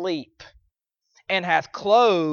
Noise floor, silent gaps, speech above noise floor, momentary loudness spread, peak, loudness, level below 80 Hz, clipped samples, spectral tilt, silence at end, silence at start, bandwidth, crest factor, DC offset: -73 dBFS; none; 52 dB; 11 LU; -4 dBFS; -21 LUFS; -64 dBFS; under 0.1%; -5 dB/octave; 0 s; 0 s; 7 kHz; 18 dB; under 0.1%